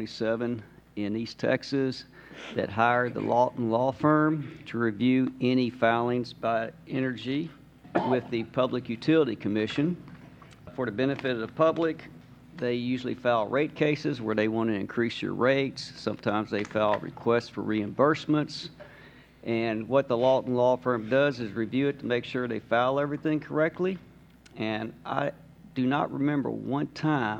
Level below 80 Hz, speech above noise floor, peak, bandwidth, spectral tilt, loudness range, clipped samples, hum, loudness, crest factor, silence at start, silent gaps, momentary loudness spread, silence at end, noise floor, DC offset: -64 dBFS; 26 dB; -8 dBFS; 9 kHz; -7 dB/octave; 4 LU; under 0.1%; none; -28 LUFS; 20 dB; 0 s; none; 9 LU; 0 s; -53 dBFS; under 0.1%